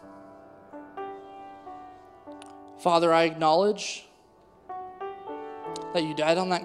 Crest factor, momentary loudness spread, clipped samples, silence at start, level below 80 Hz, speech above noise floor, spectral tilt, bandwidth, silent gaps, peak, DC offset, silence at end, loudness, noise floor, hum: 22 dB; 24 LU; under 0.1%; 0.05 s; -70 dBFS; 34 dB; -4.5 dB/octave; 12.5 kHz; none; -8 dBFS; under 0.1%; 0 s; -26 LUFS; -57 dBFS; none